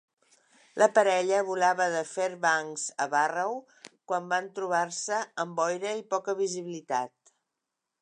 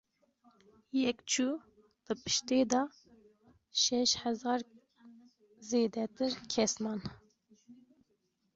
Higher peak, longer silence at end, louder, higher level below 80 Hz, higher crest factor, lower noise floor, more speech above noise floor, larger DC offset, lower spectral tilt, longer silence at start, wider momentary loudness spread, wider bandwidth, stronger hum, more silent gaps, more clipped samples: first, -8 dBFS vs -14 dBFS; first, 0.95 s vs 0.8 s; first, -28 LUFS vs -33 LUFS; second, -86 dBFS vs -70 dBFS; about the same, 22 dB vs 22 dB; first, -85 dBFS vs -78 dBFS; first, 57 dB vs 45 dB; neither; about the same, -3 dB/octave vs -2.5 dB/octave; second, 0.75 s vs 0.95 s; about the same, 10 LU vs 12 LU; first, 11 kHz vs 8 kHz; neither; neither; neither